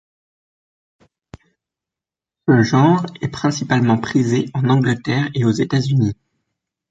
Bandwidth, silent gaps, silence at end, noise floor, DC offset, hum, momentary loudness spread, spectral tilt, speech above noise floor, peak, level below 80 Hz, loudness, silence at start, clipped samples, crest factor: 7.8 kHz; none; 0.8 s; -88 dBFS; under 0.1%; none; 7 LU; -6.5 dB/octave; 72 dB; -2 dBFS; -52 dBFS; -17 LUFS; 2.45 s; under 0.1%; 16 dB